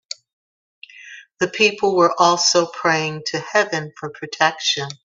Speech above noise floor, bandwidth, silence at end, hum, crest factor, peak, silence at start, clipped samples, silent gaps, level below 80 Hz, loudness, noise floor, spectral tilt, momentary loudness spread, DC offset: 23 dB; 7.8 kHz; 0.1 s; none; 20 dB; 0 dBFS; 0.95 s; under 0.1%; none; -66 dBFS; -18 LUFS; -42 dBFS; -2.5 dB/octave; 17 LU; under 0.1%